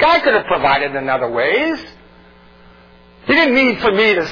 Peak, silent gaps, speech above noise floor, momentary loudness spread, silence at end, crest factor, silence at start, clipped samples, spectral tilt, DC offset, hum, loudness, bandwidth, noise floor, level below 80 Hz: -2 dBFS; none; 30 dB; 7 LU; 0 s; 14 dB; 0 s; under 0.1%; -5.5 dB/octave; under 0.1%; none; -14 LUFS; 5.4 kHz; -45 dBFS; -46 dBFS